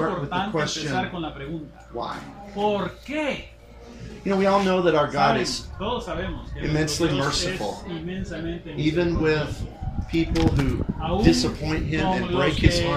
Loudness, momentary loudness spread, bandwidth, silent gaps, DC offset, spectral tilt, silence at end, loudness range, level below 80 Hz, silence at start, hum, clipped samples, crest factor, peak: -24 LUFS; 13 LU; 15 kHz; none; under 0.1%; -5.5 dB/octave; 0 s; 5 LU; -36 dBFS; 0 s; none; under 0.1%; 22 dB; -2 dBFS